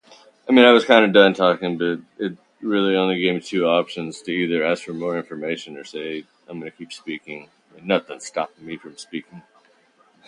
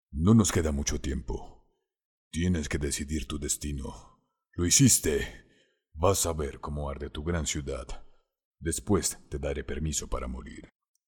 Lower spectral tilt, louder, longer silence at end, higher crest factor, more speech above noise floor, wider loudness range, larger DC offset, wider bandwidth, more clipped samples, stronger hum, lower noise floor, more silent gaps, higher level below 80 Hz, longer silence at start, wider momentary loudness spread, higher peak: about the same, -5 dB/octave vs -4 dB/octave; first, -19 LUFS vs -28 LUFS; first, 0.9 s vs 0.4 s; about the same, 20 dB vs 22 dB; about the same, 38 dB vs 38 dB; first, 13 LU vs 6 LU; neither; second, 11 kHz vs 18 kHz; neither; neither; second, -58 dBFS vs -67 dBFS; second, none vs 2.05-2.31 s, 8.45-8.51 s; second, -68 dBFS vs -42 dBFS; first, 0.45 s vs 0.1 s; first, 22 LU vs 17 LU; first, 0 dBFS vs -8 dBFS